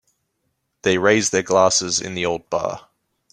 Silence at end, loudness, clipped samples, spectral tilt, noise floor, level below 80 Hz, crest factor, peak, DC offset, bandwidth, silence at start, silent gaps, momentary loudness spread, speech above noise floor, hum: 0.55 s; -19 LUFS; under 0.1%; -3 dB/octave; -73 dBFS; -58 dBFS; 20 dB; -2 dBFS; under 0.1%; 13.5 kHz; 0.85 s; none; 9 LU; 54 dB; none